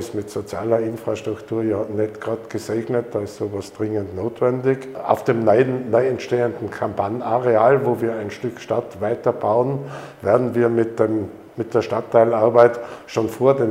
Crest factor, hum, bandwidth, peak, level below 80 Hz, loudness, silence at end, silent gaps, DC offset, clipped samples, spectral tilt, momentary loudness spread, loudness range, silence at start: 20 dB; none; 16 kHz; 0 dBFS; -62 dBFS; -20 LUFS; 0 s; none; under 0.1%; under 0.1%; -7.5 dB/octave; 12 LU; 5 LU; 0 s